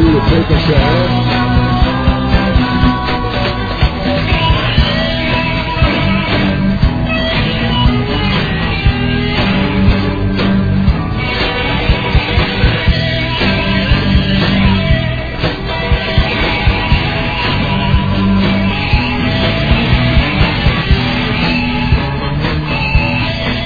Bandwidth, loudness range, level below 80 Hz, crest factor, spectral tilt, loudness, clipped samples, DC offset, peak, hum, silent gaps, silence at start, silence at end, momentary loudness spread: 5 kHz; 1 LU; -18 dBFS; 12 dB; -7.5 dB/octave; -13 LUFS; under 0.1%; under 0.1%; 0 dBFS; none; none; 0 s; 0 s; 4 LU